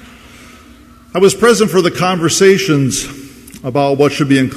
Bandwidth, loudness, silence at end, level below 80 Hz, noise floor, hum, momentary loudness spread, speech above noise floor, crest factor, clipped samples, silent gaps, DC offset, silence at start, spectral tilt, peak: 15 kHz; -12 LUFS; 0 s; -46 dBFS; -40 dBFS; none; 12 LU; 29 dB; 14 dB; under 0.1%; none; under 0.1%; 1.15 s; -4.5 dB/octave; 0 dBFS